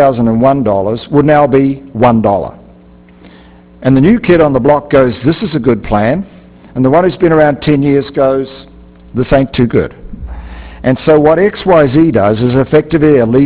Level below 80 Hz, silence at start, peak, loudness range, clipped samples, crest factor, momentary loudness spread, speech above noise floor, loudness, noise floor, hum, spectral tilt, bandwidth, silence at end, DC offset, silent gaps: -32 dBFS; 0 s; 0 dBFS; 2 LU; 0.4%; 10 dB; 12 LU; 30 dB; -10 LUFS; -39 dBFS; none; -11.5 dB/octave; 4 kHz; 0 s; under 0.1%; none